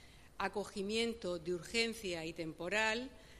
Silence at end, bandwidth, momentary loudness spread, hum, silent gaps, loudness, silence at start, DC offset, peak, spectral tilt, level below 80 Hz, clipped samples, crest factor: 0 s; 15 kHz; 8 LU; none; none; -38 LUFS; 0 s; under 0.1%; -20 dBFS; -3.5 dB/octave; -62 dBFS; under 0.1%; 20 dB